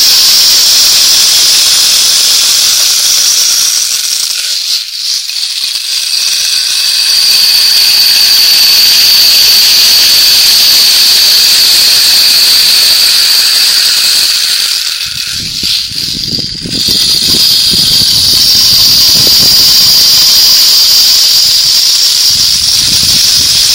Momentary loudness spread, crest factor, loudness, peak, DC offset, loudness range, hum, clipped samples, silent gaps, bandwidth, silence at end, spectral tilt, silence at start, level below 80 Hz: 9 LU; 6 dB; -3 LUFS; 0 dBFS; 0.2%; 6 LU; none; 3%; none; over 20 kHz; 0 s; 1.5 dB/octave; 0 s; -38 dBFS